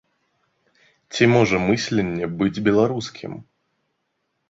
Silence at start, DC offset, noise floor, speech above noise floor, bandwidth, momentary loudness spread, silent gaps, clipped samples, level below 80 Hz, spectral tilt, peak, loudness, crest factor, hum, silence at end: 1.1 s; under 0.1%; -74 dBFS; 54 dB; 8 kHz; 17 LU; none; under 0.1%; -52 dBFS; -6 dB/octave; -2 dBFS; -20 LUFS; 20 dB; none; 1.1 s